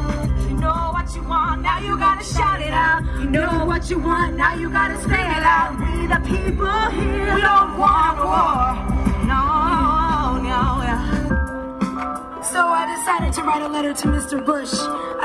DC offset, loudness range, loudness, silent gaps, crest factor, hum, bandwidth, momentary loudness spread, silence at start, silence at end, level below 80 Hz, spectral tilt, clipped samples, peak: under 0.1%; 4 LU; -19 LUFS; none; 16 dB; none; 13 kHz; 7 LU; 0 s; 0 s; -26 dBFS; -5 dB/octave; under 0.1%; -4 dBFS